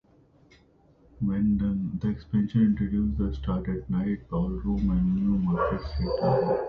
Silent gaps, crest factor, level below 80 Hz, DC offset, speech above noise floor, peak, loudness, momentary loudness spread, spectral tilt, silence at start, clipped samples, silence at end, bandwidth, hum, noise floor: none; 16 dB; -38 dBFS; under 0.1%; 33 dB; -12 dBFS; -27 LUFS; 6 LU; -10.5 dB/octave; 1.2 s; under 0.1%; 0 s; 5 kHz; none; -59 dBFS